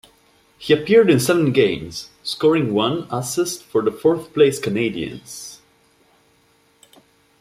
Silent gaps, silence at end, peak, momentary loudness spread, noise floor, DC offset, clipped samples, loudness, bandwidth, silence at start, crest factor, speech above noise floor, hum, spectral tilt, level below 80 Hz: none; 1.85 s; -2 dBFS; 17 LU; -58 dBFS; under 0.1%; under 0.1%; -19 LUFS; 15.5 kHz; 0.6 s; 18 dB; 40 dB; none; -5 dB/octave; -56 dBFS